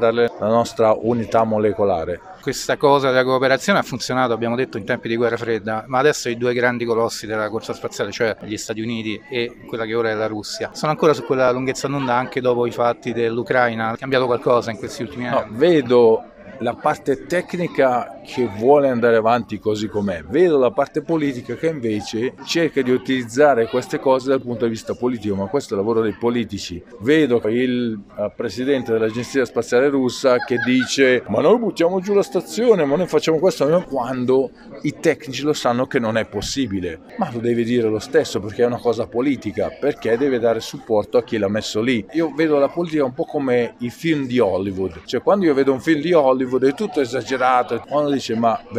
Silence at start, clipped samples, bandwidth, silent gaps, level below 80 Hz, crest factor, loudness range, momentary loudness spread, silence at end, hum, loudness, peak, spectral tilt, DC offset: 0 s; under 0.1%; 15.5 kHz; none; -54 dBFS; 18 dB; 3 LU; 9 LU; 0 s; none; -19 LUFS; -2 dBFS; -5.5 dB/octave; under 0.1%